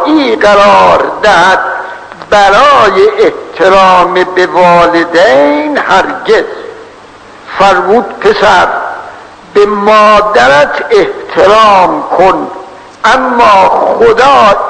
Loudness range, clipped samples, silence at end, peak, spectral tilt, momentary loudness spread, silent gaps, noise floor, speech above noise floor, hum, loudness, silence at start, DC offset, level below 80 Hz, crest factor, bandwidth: 4 LU; 5%; 0 s; 0 dBFS; -4 dB/octave; 10 LU; none; -32 dBFS; 26 dB; none; -6 LUFS; 0 s; under 0.1%; -36 dBFS; 6 dB; 11 kHz